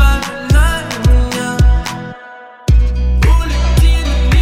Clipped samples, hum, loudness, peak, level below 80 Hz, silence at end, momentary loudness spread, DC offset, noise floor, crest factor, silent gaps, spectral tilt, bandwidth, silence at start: under 0.1%; none; -14 LUFS; 0 dBFS; -12 dBFS; 0 s; 11 LU; under 0.1%; -34 dBFS; 10 dB; none; -5.5 dB/octave; 14.5 kHz; 0 s